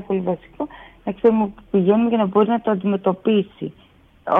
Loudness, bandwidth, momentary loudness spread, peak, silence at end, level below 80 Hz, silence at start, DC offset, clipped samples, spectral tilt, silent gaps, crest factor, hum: -20 LUFS; 3.8 kHz; 14 LU; -4 dBFS; 0 s; -54 dBFS; 0 s; under 0.1%; under 0.1%; -10 dB/octave; none; 16 dB; none